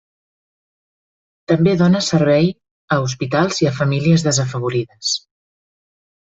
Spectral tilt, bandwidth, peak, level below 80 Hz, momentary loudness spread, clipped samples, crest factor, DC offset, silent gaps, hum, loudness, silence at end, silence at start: -5.5 dB/octave; 8 kHz; -2 dBFS; -52 dBFS; 7 LU; under 0.1%; 16 dB; under 0.1%; 2.71-2.88 s; none; -17 LUFS; 1.15 s; 1.5 s